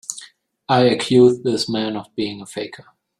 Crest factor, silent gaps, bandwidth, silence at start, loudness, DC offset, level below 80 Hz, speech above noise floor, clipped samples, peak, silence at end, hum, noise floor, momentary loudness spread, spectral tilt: 18 dB; none; 12 kHz; 0.1 s; -18 LUFS; under 0.1%; -58 dBFS; 29 dB; under 0.1%; -2 dBFS; 0.45 s; none; -47 dBFS; 17 LU; -5 dB/octave